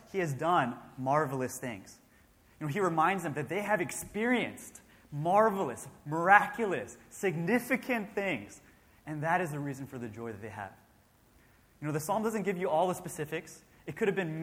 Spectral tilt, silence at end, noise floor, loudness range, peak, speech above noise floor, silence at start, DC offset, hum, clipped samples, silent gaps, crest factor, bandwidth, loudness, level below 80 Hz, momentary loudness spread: -5.5 dB/octave; 0 s; -64 dBFS; 8 LU; -8 dBFS; 33 dB; 0.1 s; under 0.1%; none; under 0.1%; none; 24 dB; 16.5 kHz; -31 LUFS; -68 dBFS; 17 LU